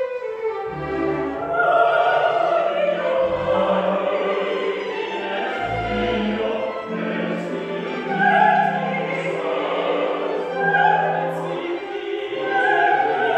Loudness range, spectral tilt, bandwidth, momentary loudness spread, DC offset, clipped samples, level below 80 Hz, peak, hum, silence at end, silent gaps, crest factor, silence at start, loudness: 4 LU; -6.5 dB/octave; 8.8 kHz; 10 LU; under 0.1%; under 0.1%; -50 dBFS; -4 dBFS; none; 0 s; none; 16 dB; 0 s; -21 LUFS